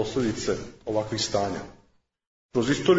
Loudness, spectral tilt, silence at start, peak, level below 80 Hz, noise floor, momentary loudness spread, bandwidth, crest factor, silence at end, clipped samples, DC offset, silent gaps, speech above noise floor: -28 LUFS; -4.5 dB/octave; 0 s; -8 dBFS; -52 dBFS; -63 dBFS; 7 LU; 8 kHz; 18 dB; 0 s; under 0.1%; under 0.1%; 2.27-2.49 s; 38 dB